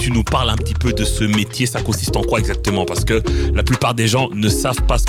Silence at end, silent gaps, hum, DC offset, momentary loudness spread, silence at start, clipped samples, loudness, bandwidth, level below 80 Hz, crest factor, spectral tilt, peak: 0 s; none; none; under 0.1%; 3 LU; 0 s; under 0.1%; -18 LUFS; 17.5 kHz; -22 dBFS; 12 dB; -5 dB/octave; -6 dBFS